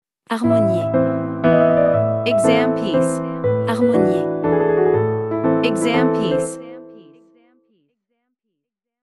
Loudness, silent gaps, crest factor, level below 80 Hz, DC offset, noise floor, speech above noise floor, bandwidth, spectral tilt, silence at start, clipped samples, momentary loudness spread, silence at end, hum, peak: -18 LUFS; none; 16 dB; -54 dBFS; under 0.1%; -80 dBFS; 64 dB; 12 kHz; -6.5 dB/octave; 0.3 s; under 0.1%; 6 LU; 2 s; none; -2 dBFS